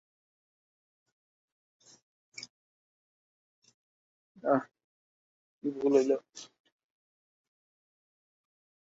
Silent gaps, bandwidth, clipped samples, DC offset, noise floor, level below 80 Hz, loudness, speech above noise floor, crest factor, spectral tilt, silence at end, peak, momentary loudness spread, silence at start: 2.50-3.62 s, 3.74-4.35 s, 4.84-5.61 s; 7.6 kHz; under 0.1%; under 0.1%; under -90 dBFS; -84 dBFS; -30 LUFS; over 61 dB; 26 dB; -5 dB/octave; 2.4 s; -12 dBFS; 23 LU; 2.4 s